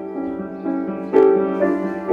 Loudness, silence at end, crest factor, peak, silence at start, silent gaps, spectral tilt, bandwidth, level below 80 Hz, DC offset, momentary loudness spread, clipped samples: -19 LUFS; 0 s; 16 dB; -2 dBFS; 0 s; none; -9 dB/octave; 4.6 kHz; -58 dBFS; under 0.1%; 12 LU; under 0.1%